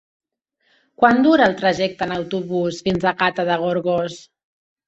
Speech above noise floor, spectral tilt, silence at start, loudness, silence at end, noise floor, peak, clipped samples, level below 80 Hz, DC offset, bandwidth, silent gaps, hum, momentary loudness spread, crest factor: 50 dB; -6 dB/octave; 1 s; -19 LUFS; 0.7 s; -68 dBFS; -2 dBFS; under 0.1%; -54 dBFS; under 0.1%; 8.2 kHz; none; none; 10 LU; 18 dB